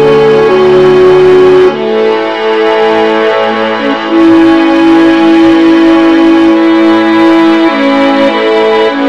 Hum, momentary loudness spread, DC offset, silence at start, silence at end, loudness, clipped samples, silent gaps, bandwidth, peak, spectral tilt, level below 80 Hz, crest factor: none; 5 LU; 1%; 0 s; 0 s; -6 LUFS; 3%; none; 7.8 kHz; 0 dBFS; -6 dB/octave; -40 dBFS; 6 dB